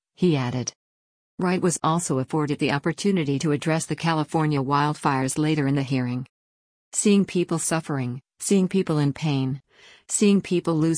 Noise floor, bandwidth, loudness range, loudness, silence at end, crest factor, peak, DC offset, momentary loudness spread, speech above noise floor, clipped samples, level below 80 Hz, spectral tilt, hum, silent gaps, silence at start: under -90 dBFS; 10.5 kHz; 1 LU; -23 LUFS; 0 s; 16 dB; -8 dBFS; under 0.1%; 9 LU; over 67 dB; under 0.1%; -62 dBFS; -5.5 dB/octave; none; 0.75-1.38 s, 6.29-6.91 s; 0.2 s